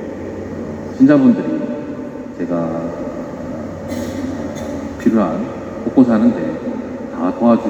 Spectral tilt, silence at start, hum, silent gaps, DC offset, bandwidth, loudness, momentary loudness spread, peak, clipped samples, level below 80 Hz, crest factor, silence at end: -8 dB/octave; 0 s; none; none; under 0.1%; 8.2 kHz; -18 LUFS; 15 LU; 0 dBFS; under 0.1%; -46 dBFS; 18 dB; 0 s